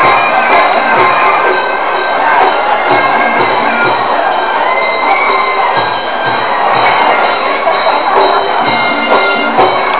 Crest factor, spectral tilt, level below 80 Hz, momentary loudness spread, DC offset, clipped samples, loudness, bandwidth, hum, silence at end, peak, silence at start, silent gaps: 10 dB; -7 dB/octave; -52 dBFS; 4 LU; 4%; under 0.1%; -9 LUFS; 4 kHz; none; 0 s; 0 dBFS; 0 s; none